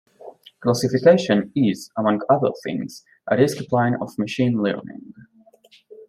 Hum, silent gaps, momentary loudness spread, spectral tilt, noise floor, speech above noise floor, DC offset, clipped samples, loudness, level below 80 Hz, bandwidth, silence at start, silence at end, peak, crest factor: none; none; 14 LU; -6.5 dB/octave; -54 dBFS; 34 dB; under 0.1%; under 0.1%; -21 LUFS; -64 dBFS; 15 kHz; 0.25 s; 0.05 s; -2 dBFS; 18 dB